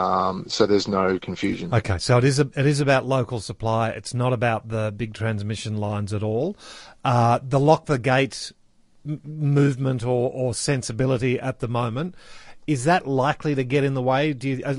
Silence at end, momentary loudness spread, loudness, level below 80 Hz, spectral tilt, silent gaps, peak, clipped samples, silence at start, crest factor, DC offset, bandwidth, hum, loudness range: 0 s; 9 LU; -23 LUFS; -50 dBFS; -6 dB/octave; none; -4 dBFS; under 0.1%; 0 s; 20 dB; under 0.1%; 11.5 kHz; none; 4 LU